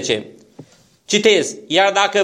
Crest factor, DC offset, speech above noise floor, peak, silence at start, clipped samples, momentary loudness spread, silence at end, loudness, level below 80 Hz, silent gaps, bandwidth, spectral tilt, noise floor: 18 dB; under 0.1%; 29 dB; 0 dBFS; 0 s; under 0.1%; 8 LU; 0 s; -16 LUFS; -64 dBFS; none; 13 kHz; -2.5 dB/octave; -45 dBFS